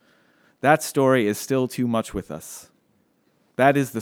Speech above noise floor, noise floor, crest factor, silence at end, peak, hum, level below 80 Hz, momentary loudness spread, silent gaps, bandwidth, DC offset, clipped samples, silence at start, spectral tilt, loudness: 44 dB; -65 dBFS; 22 dB; 0 s; -2 dBFS; none; -54 dBFS; 17 LU; none; 19.5 kHz; under 0.1%; under 0.1%; 0.65 s; -5.5 dB/octave; -21 LUFS